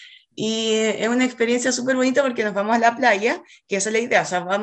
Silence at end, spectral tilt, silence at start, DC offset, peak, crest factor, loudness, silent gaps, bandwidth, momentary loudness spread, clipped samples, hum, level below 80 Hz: 0 s; -3 dB/octave; 0 s; under 0.1%; -4 dBFS; 18 dB; -20 LUFS; none; 9.4 kHz; 7 LU; under 0.1%; none; -68 dBFS